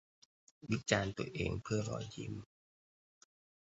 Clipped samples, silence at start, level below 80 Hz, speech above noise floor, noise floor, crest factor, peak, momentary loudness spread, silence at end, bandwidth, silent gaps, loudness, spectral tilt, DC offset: under 0.1%; 0.65 s; -58 dBFS; over 52 dB; under -90 dBFS; 28 dB; -14 dBFS; 12 LU; 1.35 s; 8 kHz; none; -39 LUFS; -5 dB/octave; under 0.1%